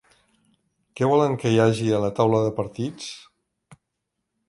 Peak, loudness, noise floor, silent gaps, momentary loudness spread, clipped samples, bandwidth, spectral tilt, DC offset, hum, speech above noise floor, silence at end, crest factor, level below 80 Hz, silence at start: -6 dBFS; -22 LUFS; -80 dBFS; none; 14 LU; under 0.1%; 11.5 kHz; -6.5 dB/octave; under 0.1%; none; 59 dB; 1.3 s; 20 dB; -58 dBFS; 0.95 s